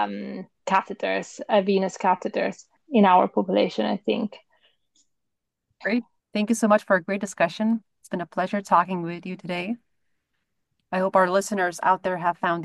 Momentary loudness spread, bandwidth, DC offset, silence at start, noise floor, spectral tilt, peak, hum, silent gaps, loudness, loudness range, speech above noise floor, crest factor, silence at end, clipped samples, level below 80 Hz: 12 LU; 12.5 kHz; under 0.1%; 0 s; -82 dBFS; -5.5 dB/octave; -6 dBFS; none; none; -24 LUFS; 5 LU; 59 dB; 20 dB; 0 s; under 0.1%; -72 dBFS